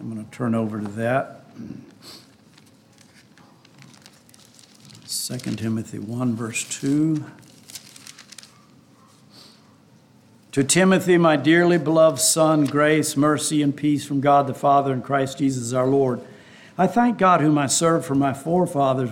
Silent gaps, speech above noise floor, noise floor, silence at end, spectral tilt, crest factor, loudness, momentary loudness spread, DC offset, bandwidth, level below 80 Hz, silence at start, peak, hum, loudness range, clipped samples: none; 34 dB; -53 dBFS; 0 s; -5 dB/octave; 18 dB; -20 LUFS; 21 LU; under 0.1%; 17 kHz; -64 dBFS; 0 s; -4 dBFS; none; 14 LU; under 0.1%